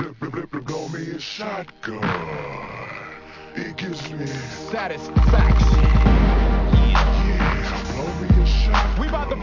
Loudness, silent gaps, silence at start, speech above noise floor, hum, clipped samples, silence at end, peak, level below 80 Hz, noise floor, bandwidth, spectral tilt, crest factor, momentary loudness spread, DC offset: -21 LUFS; none; 0 s; 20 dB; none; under 0.1%; 0 s; -2 dBFS; -20 dBFS; -39 dBFS; 7.2 kHz; -6.5 dB/octave; 16 dB; 15 LU; under 0.1%